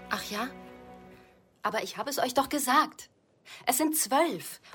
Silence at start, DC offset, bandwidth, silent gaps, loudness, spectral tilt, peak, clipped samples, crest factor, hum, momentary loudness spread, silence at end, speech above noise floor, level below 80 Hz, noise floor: 0 s; under 0.1%; 17 kHz; none; -29 LUFS; -2 dB/octave; -12 dBFS; under 0.1%; 18 dB; none; 23 LU; 0 s; 29 dB; -66 dBFS; -58 dBFS